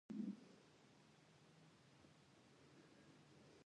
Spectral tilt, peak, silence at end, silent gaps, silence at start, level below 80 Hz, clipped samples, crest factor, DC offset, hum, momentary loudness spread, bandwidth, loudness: -6.5 dB/octave; -38 dBFS; 0 s; none; 0.1 s; under -90 dBFS; under 0.1%; 22 dB; under 0.1%; none; 18 LU; 10 kHz; -60 LUFS